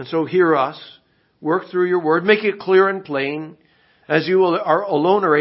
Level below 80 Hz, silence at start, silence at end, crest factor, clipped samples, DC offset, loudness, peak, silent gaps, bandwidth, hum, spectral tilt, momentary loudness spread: -72 dBFS; 0 s; 0 s; 16 dB; under 0.1%; under 0.1%; -18 LUFS; -2 dBFS; none; 5.8 kHz; none; -10.5 dB/octave; 9 LU